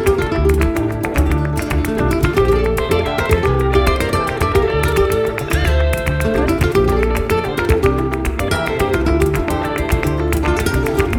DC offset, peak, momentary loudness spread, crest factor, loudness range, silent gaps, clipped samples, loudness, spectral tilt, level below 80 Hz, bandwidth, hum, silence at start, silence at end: under 0.1%; -2 dBFS; 4 LU; 14 dB; 1 LU; none; under 0.1%; -16 LUFS; -6 dB/octave; -22 dBFS; 18.5 kHz; none; 0 s; 0 s